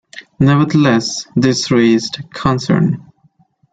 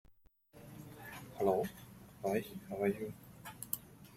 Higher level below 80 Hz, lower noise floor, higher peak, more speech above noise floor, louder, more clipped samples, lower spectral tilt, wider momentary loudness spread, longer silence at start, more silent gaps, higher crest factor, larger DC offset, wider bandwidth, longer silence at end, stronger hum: first, -48 dBFS vs -68 dBFS; second, -55 dBFS vs -66 dBFS; first, -2 dBFS vs -18 dBFS; first, 41 dB vs 30 dB; first, -14 LUFS vs -39 LUFS; neither; about the same, -5.5 dB/octave vs -5.5 dB/octave; second, 7 LU vs 20 LU; about the same, 0.15 s vs 0.1 s; neither; second, 12 dB vs 24 dB; neither; second, 9.2 kHz vs 16.5 kHz; first, 0.7 s vs 0 s; neither